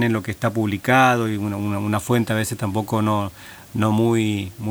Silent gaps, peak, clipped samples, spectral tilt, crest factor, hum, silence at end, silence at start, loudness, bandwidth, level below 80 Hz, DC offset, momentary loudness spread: none; -2 dBFS; under 0.1%; -6 dB/octave; 20 dB; none; 0 s; 0 s; -21 LUFS; over 20 kHz; -54 dBFS; under 0.1%; 9 LU